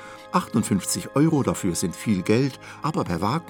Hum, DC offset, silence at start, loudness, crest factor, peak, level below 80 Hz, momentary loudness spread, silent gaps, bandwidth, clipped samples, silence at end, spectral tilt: none; under 0.1%; 0 s; -24 LUFS; 18 dB; -6 dBFS; -56 dBFS; 6 LU; none; over 20 kHz; under 0.1%; 0 s; -5.5 dB/octave